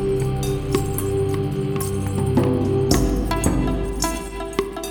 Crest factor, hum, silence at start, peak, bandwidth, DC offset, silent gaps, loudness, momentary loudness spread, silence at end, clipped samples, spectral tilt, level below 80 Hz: 20 dB; none; 0 s; 0 dBFS; over 20 kHz; under 0.1%; none; -22 LUFS; 6 LU; 0 s; under 0.1%; -6 dB/octave; -30 dBFS